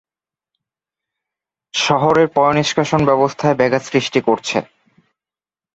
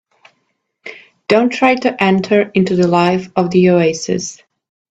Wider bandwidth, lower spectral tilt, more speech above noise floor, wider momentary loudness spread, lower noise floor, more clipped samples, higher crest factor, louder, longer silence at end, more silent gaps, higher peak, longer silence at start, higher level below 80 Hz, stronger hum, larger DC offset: about the same, 8.2 kHz vs 8 kHz; about the same, -5 dB/octave vs -6 dB/octave; first, over 75 dB vs 54 dB; second, 6 LU vs 20 LU; first, under -90 dBFS vs -67 dBFS; neither; about the same, 18 dB vs 14 dB; about the same, -16 LUFS vs -14 LUFS; first, 1.1 s vs 0.55 s; neither; about the same, -2 dBFS vs 0 dBFS; first, 1.75 s vs 0.85 s; about the same, -54 dBFS vs -56 dBFS; neither; neither